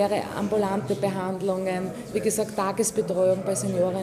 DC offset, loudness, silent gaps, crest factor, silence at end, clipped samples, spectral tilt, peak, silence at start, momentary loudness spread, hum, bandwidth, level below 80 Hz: under 0.1%; -26 LUFS; none; 14 dB; 0 s; under 0.1%; -5 dB/octave; -12 dBFS; 0 s; 5 LU; none; 15.5 kHz; -60 dBFS